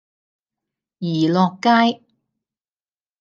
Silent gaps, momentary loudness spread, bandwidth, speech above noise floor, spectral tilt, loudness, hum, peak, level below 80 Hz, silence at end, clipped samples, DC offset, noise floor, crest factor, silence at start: none; 13 LU; 7.4 kHz; over 73 dB; -6.5 dB/octave; -18 LUFS; none; -2 dBFS; -70 dBFS; 1.25 s; under 0.1%; under 0.1%; under -90 dBFS; 18 dB; 1 s